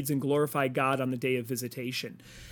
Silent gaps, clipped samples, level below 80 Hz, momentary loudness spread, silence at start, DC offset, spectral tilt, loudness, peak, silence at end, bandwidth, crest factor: none; under 0.1%; -64 dBFS; 8 LU; 0 s; under 0.1%; -5 dB/octave; -30 LUFS; -14 dBFS; 0 s; 19 kHz; 18 dB